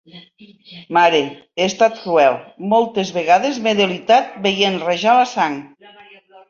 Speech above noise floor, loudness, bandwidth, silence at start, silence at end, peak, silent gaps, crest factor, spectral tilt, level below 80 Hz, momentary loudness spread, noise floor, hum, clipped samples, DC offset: 28 dB; -16 LUFS; 7.4 kHz; 0.15 s; 0.85 s; -2 dBFS; none; 16 dB; -4 dB/octave; -62 dBFS; 7 LU; -45 dBFS; none; under 0.1%; under 0.1%